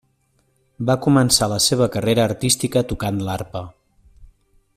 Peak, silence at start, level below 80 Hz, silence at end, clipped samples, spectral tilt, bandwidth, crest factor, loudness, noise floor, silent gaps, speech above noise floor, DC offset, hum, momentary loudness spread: -2 dBFS; 0.8 s; -46 dBFS; 0.5 s; under 0.1%; -4.5 dB/octave; 16 kHz; 18 dB; -18 LUFS; -64 dBFS; none; 45 dB; under 0.1%; none; 13 LU